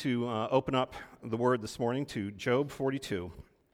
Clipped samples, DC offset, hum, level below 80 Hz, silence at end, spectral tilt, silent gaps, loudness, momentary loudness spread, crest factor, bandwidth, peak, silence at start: under 0.1%; under 0.1%; none; -60 dBFS; 0.3 s; -6 dB/octave; none; -32 LUFS; 9 LU; 20 dB; 16 kHz; -14 dBFS; 0 s